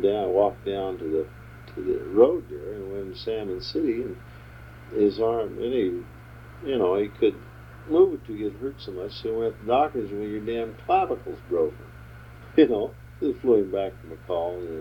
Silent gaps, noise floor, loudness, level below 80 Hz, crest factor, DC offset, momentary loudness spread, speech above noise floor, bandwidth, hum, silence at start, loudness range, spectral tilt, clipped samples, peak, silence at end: none; -44 dBFS; -26 LUFS; -50 dBFS; 20 dB; under 0.1%; 23 LU; 19 dB; 18.5 kHz; none; 0 s; 2 LU; -8 dB/octave; under 0.1%; -6 dBFS; 0 s